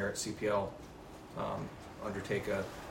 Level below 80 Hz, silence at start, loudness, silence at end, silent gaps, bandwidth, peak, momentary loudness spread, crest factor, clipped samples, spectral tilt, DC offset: -58 dBFS; 0 s; -38 LUFS; 0 s; none; 16 kHz; -20 dBFS; 15 LU; 18 dB; under 0.1%; -4.5 dB/octave; under 0.1%